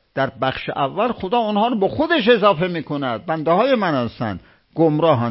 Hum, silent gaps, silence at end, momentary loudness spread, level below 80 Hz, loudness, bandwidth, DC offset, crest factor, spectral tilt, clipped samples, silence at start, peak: none; none; 0 s; 9 LU; -50 dBFS; -19 LUFS; 5.8 kHz; under 0.1%; 18 dB; -11 dB/octave; under 0.1%; 0.15 s; -2 dBFS